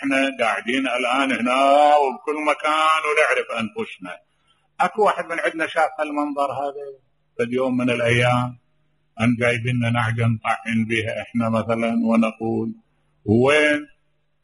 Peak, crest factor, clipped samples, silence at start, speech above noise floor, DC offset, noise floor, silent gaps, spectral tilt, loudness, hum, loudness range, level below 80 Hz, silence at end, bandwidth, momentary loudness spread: -2 dBFS; 18 dB; under 0.1%; 0 s; 47 dB; under 0.1%; -68 dBFS; none; -6 dB/octave; -20 LUFS; none; 5 LU; -60 dBFS; 0.6 s; 11.5 kHz; 12 LU